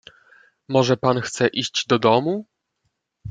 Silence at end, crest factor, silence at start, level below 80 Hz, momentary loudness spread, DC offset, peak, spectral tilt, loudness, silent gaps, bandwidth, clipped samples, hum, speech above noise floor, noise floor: 0 s; 20 dB; 0.7 s; -62 dBFS; 9 LU; under 0.1%; -2 dBFS; -5 dB/octave; -20 LUFS; none; 9.4 kHz; under 0.1%; none; 55 dB; -74 dBFS